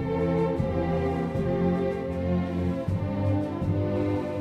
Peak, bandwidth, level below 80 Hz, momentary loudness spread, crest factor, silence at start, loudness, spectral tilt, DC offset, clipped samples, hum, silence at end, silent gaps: -14 dBFS; 8.4 kHz; -42 dBFS; 3 LU; 12 dB; 0 s; -27 LUFS; -9.5 dB/octave; under 0.1%; under 0.1%; none; 0 s; none